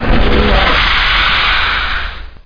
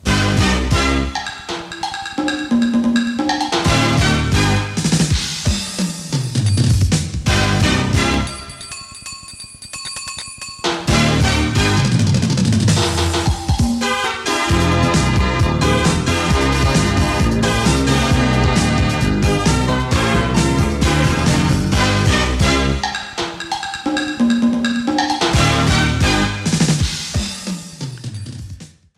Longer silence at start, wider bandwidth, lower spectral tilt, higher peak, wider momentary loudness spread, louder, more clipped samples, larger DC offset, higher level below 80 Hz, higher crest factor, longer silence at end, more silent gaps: about the same, 0 s vs 0.05 s; second, 5.2 kHz vs 14.5 kHz; about the same, -5.5 dB/octave vs -4.5 dB/octave; about the same, -2 dBFS vs -2 dBFS; second, 8 LU vs 12 LU; first, -11 LUFS vs -16 LUFS; neither; neither; first, -18 dBFS vs -26 dBFS; about the same, 10 dB vs 14 dB; second, 0.1 s vs 0.3 s; neither